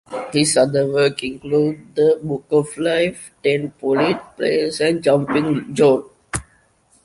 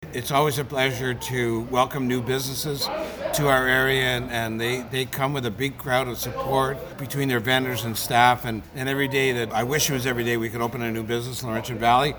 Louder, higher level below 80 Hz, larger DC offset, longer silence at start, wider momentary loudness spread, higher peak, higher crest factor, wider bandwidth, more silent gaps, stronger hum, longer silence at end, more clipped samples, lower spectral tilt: first, -19 LUFS vs -24 LUFS; about the same, -52 dBFS vs -48 dBFS; neither; about the same, 0.1 s vs 0 s; about the same, 7 LU vs 8 LU; about the same, -2 dBFS vs -2 dBFS; second, 16 dB vs 22 dB; second, 11.5 kHz vs over 20 kHz; neither; neither; first, 0.65 s vs 0 s; neither; about the same, -5 dB/octave vs -4 dB/octave